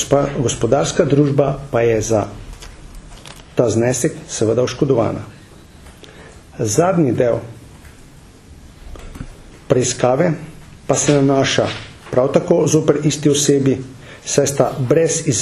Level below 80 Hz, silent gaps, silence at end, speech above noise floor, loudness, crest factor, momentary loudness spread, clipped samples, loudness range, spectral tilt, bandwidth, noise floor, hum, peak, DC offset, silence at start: -42 dBFS; none; 0 s; 26 dB; -16 LUFS; 18 dB; 22 LU; under 0.1%; 5 LU; -5 dB/octave; 13.5 kHz; -42 dBFS; none; 0 dBFS; under 0.1%; 0 s